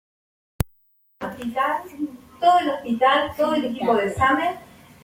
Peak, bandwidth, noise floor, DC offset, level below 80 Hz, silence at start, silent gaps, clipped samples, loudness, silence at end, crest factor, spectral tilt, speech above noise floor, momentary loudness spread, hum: -4 dBFS; 16.5 kHz; -62 dBFS; under 0.1%; -46 dBFS; 0.6 s; none; under 0.1%; -22 LUFS; 0.4 s; 18 dB; -5.5 dB/octave; 41 dB; 14 LU; none